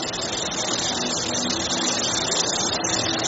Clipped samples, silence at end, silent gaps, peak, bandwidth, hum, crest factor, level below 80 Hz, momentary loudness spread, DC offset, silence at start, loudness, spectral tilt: under 0.1%; 0 s; none; -8 dBFS; 8.2 kHz; none; 16 dB; -54 dBFS; 3 LU; under 0.1%; 0 s; -22 LUFS; -1.5 dB/octave